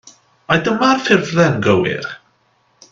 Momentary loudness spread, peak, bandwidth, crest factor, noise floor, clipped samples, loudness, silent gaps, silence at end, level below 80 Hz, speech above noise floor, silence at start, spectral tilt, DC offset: 13 LU; 0 dBFS; 7.6 kHz; 18 dB; -59 dBFS; under 0.1%; -15 LUFS; none; 0.75 s; -52 dBFS; 45 dB; 0.5 s; -5.5 dB/octave; under 0.1%